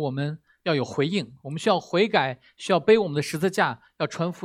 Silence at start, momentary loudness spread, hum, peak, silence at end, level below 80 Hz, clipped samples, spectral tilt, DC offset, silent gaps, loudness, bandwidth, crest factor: 0 s; 11 LU; none; -4 dBFS; 0 s; -68 dBFS; under 0.1%; -5.5 dB/octave; under 0.1%; none; -24 LUFS; 15 kHz; 20 dB